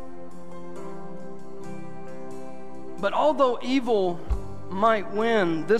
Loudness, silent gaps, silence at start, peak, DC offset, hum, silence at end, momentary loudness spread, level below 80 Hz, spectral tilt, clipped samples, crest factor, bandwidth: -24 LUFS; none; 0 s; -8 dBFS; 3%; none; 0 s; 19 LU; -42 dBFS; -6 dB/octave; under 0.1%; 18 dB; 13 kHz